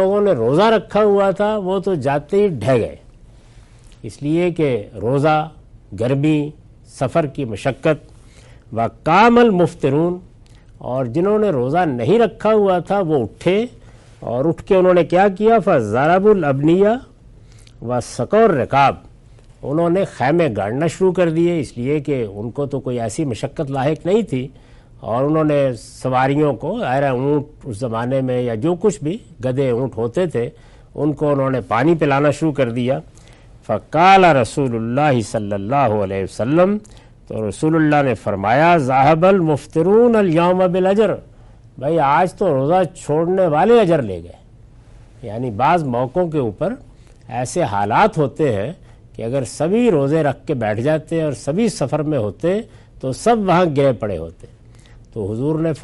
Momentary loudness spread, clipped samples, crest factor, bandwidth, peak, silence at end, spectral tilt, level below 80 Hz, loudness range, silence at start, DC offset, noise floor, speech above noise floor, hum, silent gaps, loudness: 12 LU; under 0.1%; 16 dB; 11.5 kHz; 0 dBFS; 0 s; -7 dB/octave; -46 dBFS; 5 LU; 0 s; under 0.1%; -44 dBFS; 28 dB; none; none; -17 LUFS